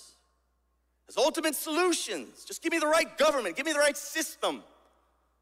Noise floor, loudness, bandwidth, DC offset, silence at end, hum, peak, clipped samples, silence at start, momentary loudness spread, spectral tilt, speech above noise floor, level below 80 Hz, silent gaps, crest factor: -73 dBFS; -28 LUFS; 16 kHz; under 0.1%; 0.8 s; none; -12 dBFS; under 0.1%; 0 s; 10 LU; -1 dB/octave; 45 dB; -70 dBFS; none; 18 dB